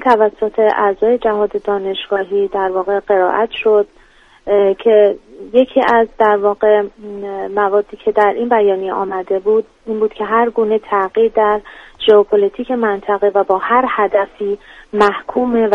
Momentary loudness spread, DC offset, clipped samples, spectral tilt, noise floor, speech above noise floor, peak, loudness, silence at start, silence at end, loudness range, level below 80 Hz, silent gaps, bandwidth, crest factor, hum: 8 LU; under 0.1%; under 0.1%; -6.5 dB/octave; -47 dBFS; 32 dB; 0 dBFS; -15 LUFS; 0 s; 0 s; 2 LU; -50 dBFS; none; 5.6 kHz; 14 dB; none